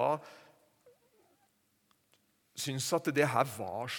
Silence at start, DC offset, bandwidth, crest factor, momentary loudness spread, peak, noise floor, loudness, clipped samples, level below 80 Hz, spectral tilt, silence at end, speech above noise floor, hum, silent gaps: 0 s; under 0.1%; 19 kHz; 22 dB; 14 LU; -14 dBFS; -74 dBFS; -33 LUFS; under 0.1%; -82 dBFS; -4 dB/octave; 0 s; 41 dB; none; none